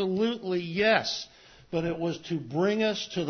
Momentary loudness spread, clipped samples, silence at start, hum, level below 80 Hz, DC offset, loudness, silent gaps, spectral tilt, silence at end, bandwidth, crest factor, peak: 10 LU; under 0.1%; 0 s; none; -62 dBFS; under 0.1%; -28 LUFS; none; -5 dB/octave; 0 s; 6.6 kHz; 20 dB; -8 dBFS